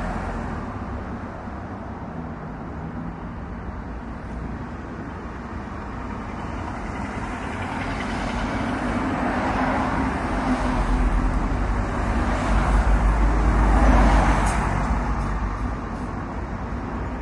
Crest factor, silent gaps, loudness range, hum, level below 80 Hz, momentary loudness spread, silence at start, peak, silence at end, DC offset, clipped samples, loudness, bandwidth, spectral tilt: 18 dB; none; 12 LU; none; -26 dBFS; 13 LU; 0 s; -4 dBFS; 0 s; under 0.1%; under 0.1%; -25 LUFS; 11 kHz; -6.5 dB/octave